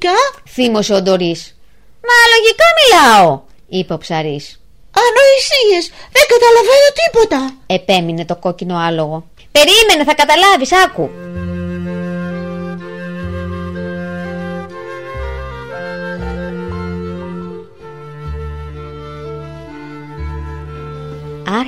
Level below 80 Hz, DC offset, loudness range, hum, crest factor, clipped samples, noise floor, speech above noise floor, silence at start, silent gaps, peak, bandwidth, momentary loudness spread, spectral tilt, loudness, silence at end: -36 dBFS; under 0.1%; 17 LU; none; 14 dB; under 0.1%; -47 dBFS; 37 dB; 0 s; none; 0 dBFS; 16 kHz; 21 LU; -3.5 dB/octave; -11 LUFS; 0 s